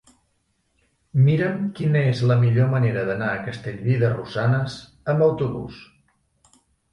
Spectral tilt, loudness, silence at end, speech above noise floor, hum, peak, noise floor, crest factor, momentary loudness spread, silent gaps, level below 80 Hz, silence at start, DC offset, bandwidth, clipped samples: -8.5 dB/octave; -22 LUFS; 1.1 s; 49 dB; none; -6 dBFS; -69 dBFS; 16 dB; 11 LU; none; -54 dBFS; 1.15 s; under 0.1%; 8.6 kHz; under 0.1%